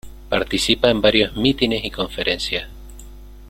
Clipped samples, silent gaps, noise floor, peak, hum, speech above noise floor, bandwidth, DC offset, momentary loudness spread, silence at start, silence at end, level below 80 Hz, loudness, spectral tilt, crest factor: under 0.1%; none; -39 dBFS; 0 dBFS; none; 20 dB; 16.5 kHz; under 0.1%; 9 LU; 0.05 s; 0 s; -38 dBFS; -19 LUFS; -4 dB/octave; 20 dB